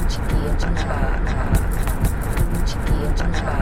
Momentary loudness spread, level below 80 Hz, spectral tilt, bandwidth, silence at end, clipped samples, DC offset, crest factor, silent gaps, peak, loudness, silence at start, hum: 2 LU; -20 dBFS; -6 dB/octave; 16.5 kHz; 0 s; under 0.1%; under 0.1%; 14 dB; none; -6 dBFS; -23 LUFS; 0 s; none